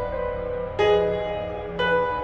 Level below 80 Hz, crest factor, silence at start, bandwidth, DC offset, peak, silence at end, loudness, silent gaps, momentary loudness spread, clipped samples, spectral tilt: -42 dBFS; 14 dB; 0 s; 7.2 kHz; under 0.1%; -10 dBFS; 0 s; -24 LUFS; none; 9 LU; under 0.1%; -6 dB/octave